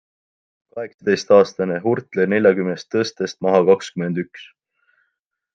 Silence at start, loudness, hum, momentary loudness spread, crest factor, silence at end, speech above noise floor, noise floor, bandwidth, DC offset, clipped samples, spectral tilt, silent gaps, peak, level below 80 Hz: 0.75 s; -19 LUFS; none; 14 LU; 18 dB; 1.1 s; 57 dB; -75 dBFS; 7.6 kHz; under 0.1%; under 0.1%; -6 dB/octave; 0.94-0.98 s; -2 dBFS; -68 dBFS